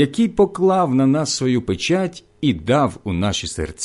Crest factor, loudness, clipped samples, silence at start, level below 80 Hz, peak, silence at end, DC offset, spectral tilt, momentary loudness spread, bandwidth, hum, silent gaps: 14 dB; -19 LUFS; under 0.1%; 0 s; -40 dBFS; -4 dBFS; 0 s; under 0.1%; -5.5 dB/octave; 7 LU; 11.5 kHz; none; none